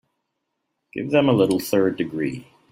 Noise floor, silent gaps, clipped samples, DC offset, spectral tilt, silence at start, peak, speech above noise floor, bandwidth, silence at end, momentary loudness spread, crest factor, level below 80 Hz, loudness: -77 dBFS; none; under 0.1%; under 0.1%; -6 dB/octave; 0.95 s; -4 dBFS; 57 dB; 16 kHz; 0.3 s; 15 LU; 18 dB; -62 dBFS; -21 LUFS